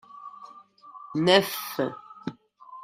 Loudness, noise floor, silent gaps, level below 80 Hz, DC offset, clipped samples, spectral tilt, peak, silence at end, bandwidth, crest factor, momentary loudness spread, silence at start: -24 LUFS; -50 dBFS; none; -70 dBFS; under 0.1%; under 0.1%; -4.5 dB/octave; -4 dBFS; 0 s; 16 kHz; 24 dB; 26 LU; 0.15 s